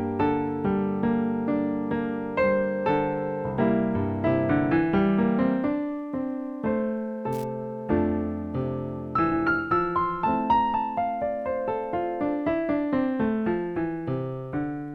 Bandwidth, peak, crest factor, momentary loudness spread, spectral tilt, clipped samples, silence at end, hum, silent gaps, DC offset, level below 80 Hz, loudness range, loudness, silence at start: 6.2 kHz; -10 dBFS; 14 dB; 8 LU; -9 dB/octave; under 0.1%; 0 s; none; none; under 0.1%; -50 dBFS; 3 LU; -26 LUFS; 0 s